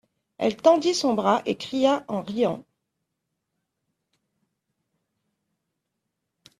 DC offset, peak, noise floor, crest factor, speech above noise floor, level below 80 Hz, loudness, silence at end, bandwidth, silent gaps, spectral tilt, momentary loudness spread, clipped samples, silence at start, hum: under 0.1%; -4 dBFS; -81 dBFS; 24 dB; 58 dB; -70 dBFS; -23 LUFS; 4 s; 13 kHz; none; -4.5 dB/octave; 9 LU; under 0.1%; 0.4 s; none